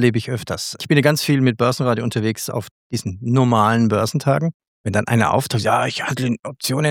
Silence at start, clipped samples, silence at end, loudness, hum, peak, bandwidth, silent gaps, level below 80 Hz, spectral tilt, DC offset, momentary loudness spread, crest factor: 0 s; under 0.1%; 0 s; -19 LUFS; none; 0 dBFS; 18.5 kHz; 2.71-2.90 s, 4.54-4.60 s, 4.68-4.84 s; -56 dBFS; -5.5 dB/octave; under 0.1%; 10 LU; 18 dB